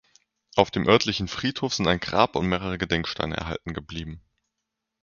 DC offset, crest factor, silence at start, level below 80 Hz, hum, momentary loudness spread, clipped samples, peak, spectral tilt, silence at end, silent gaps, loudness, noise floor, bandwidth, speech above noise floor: under 0.1%; 26 dB; 0.55 s; -46 dBFS; none; 14 LU; under 0.1%; 0 dBFS; -5 dB/octave; 0.85 s; none; -25 LUFS; -83 dBFS; 7.2 kHz; 58 dB